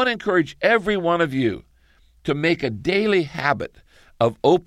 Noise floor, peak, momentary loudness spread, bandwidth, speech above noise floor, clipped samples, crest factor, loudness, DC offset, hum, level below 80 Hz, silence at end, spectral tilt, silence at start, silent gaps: -56 dBFS; -4 dBFS; 8 LU; 12 kHz; 36 dB; under 0.1%; 18 dB; -21 LUFS; under 0.1%; none; -52 dBFS; 0.05 s; -6.5 dB/octave; 0 s; none